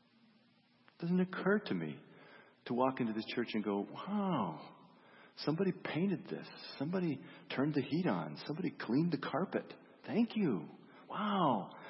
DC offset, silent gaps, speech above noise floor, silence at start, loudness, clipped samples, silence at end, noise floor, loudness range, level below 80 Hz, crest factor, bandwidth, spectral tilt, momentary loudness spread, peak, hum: under 0.1%; none; 33 dB; 1 s; -37 LUFS; under 0.1%; 0 s; -70 dBFS; 2 LU; -84 dBFS; 20 dB; 5.8 kHz; -5.5 dB/octave; 12 LU; -18 dBFS; none